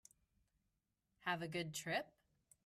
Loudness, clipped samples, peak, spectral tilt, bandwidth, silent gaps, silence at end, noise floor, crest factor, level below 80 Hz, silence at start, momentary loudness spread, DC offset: -44 LUFS; under 0.1%; -26 dBFS; -3.5 dB/octave; 15 kHz; none; 0.55 s; -87 dBFS; 22 dB; -82 dBFS; 1.2 s; 5 LU; under 0.1%